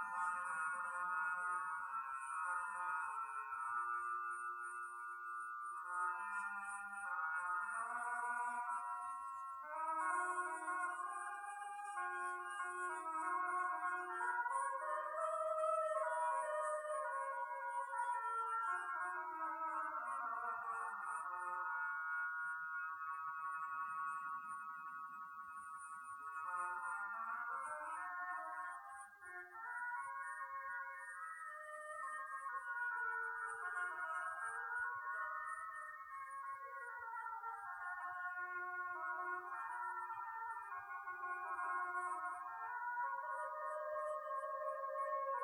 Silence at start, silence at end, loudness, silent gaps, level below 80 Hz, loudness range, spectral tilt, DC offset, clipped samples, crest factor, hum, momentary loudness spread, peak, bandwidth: 0 s; 0 s; -44 LUFS; none; under -90 dBFS; 6 LU; -1.5 dB/octave; under 0.1%; under 0.1%; 16 dB; none; 8 LU; -28 dBFS; 19 kHz